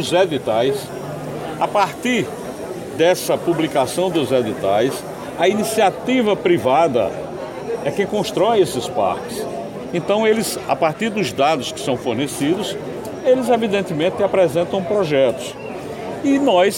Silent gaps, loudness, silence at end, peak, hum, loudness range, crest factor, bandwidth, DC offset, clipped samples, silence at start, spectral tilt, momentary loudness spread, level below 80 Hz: none; -19 LUFS; 0 s; -4 dBFS; none; 2 LU; 14 dB; 16.5 kHz; under 0.1%; under 0.1%; 0 s; -5 dB/octave; 12 LU; -54 dBFS